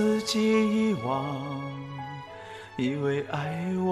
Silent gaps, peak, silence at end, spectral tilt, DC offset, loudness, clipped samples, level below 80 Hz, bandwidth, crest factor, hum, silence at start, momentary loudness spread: none; -12 dBFS; 0 s; -6 dB/octave; under 0.1%; -28 LUFS; under 0.1%; -64 dBFS; 13.5 kHz; 14 dB; none; 0 s; 16 LU